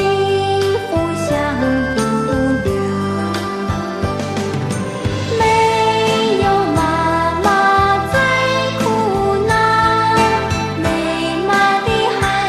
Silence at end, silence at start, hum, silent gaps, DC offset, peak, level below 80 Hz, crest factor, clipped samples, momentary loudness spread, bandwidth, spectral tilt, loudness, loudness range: 0 s; 0 s; none; none; under 0.1%; -2 dBFS; -38 dBFS; 14 dB; under 0.1%; 7 LU; 14 kHz; -5 dB/octave; -16 LUFS; 4 LU